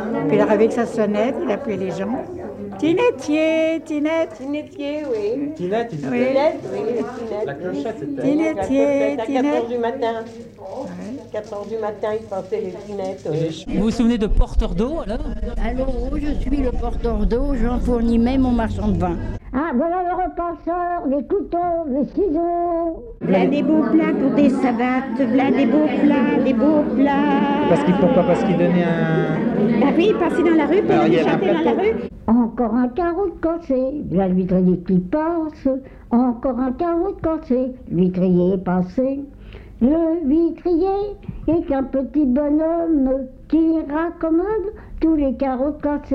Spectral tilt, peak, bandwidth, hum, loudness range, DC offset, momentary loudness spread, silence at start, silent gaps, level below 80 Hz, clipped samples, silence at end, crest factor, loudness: -8 dB/octave; -4 dBFS; 9.6 kHz; none; 6 LU; under 0.1%; 10 LU; 0 s; none; -32 dBFS; under 0.1%; 0 s; 14 dB; -20 LUFS